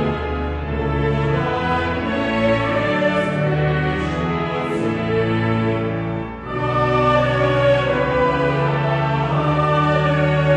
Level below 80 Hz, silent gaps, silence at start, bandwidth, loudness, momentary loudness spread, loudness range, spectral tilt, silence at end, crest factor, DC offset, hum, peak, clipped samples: -34 dBFS; none; 0 s; 8.8 kHz; -19 LUFS; 6 LU; 3 LU; -7.5 dB/octave; 0 s; 14 dB; under 0.1%; none; -4 dBFS; under 0.1%